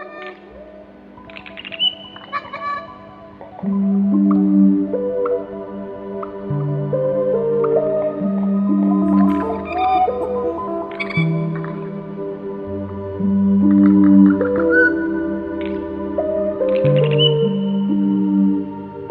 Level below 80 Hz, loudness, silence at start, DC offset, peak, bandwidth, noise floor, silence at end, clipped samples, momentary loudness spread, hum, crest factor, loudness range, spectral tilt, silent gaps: -50 dBFS; -18 LUFS; 0 s; under 0.1%; -2 dBFS; 5 kHz; -40 dBFS; 0 s; under 0.1%; 15 LU; none; 16 dB; 8 LU; -9.5 dB/octave; none